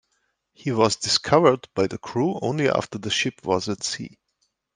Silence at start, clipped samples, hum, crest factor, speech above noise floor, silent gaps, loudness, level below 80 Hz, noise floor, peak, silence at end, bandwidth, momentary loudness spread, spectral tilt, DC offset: 0.65 s; under 0.1%; none; 22 dB; 50 dB; none; -23 LUFS; -60 dBFS; -73 dBFS; -2 dBFS; 0.7 s; 10 kHz; 10 LU; -4 dB/octave; under 0.1%